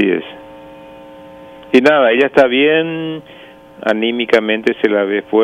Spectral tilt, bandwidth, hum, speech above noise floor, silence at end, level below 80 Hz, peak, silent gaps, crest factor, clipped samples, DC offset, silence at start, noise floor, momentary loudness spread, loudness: -5.5 dB/octave; 10 kHz; none; 23 dB; 0 s; -58 dBFS; 0 dBFS; none; 14 dB; under 0.1%; under 0.1%; 0 s; -36 dBFS; 13 LU; -14 LUFS